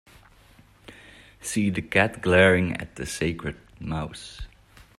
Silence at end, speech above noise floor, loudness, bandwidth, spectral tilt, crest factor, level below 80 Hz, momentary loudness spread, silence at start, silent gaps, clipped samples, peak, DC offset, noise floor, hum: 0.5 s; 31 dB; -24 LUFS; 14 kHz; -5 dB/octave; 22 dB; -48 dBFS; 21 LU; 0.9 s; none; under 0.1%; -4 dBFS; under 0.1%; -55 dBFS; none